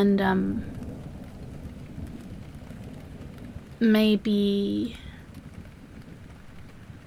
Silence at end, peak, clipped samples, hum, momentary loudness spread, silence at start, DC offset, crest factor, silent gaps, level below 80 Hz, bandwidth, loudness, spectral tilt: 0.05 s; -10 dBFS; under 0.1%; none; 24 LU; 0 s; under 0.1%; 18 dB; none; -48 dBFS; 14.5 kHz; -25 LUFS; -7.5 dB/octave